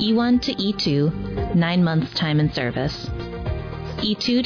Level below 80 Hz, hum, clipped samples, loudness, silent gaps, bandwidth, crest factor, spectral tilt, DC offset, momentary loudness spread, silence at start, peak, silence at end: -38 dBFS; none; under 0.1%; -22 LUFS; none; 5.4 kHz; 12 dB; -6.5 dB/octave; under 0.1%; 11 LU; 0 s; -10 dBFS; 0 s